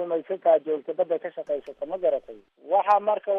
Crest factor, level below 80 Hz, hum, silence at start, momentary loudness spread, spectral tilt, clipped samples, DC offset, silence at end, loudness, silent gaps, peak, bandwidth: 16 dB; -70 dBFS; none; 0 s; 10 LU; -6.5 dB/octave; under 0.1%; under 0.1%; 0 s; -25 LUFS; none; -8 dBFS; 5.8 kHz